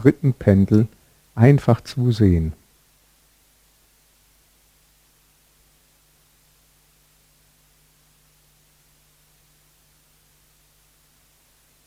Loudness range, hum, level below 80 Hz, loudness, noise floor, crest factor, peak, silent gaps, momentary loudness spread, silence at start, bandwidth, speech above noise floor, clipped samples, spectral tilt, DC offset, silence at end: 8 LU; 50 Hz at -55 dBFS; -44 dBFS; -18 LUFS; -59 dBFS; 22 dB; 0 dBFS; none; 13 LU; 0 s; 15.5 kHz; 43 dB; under 0.1%; -9 dB/octave; under 0.1%; 9.35 s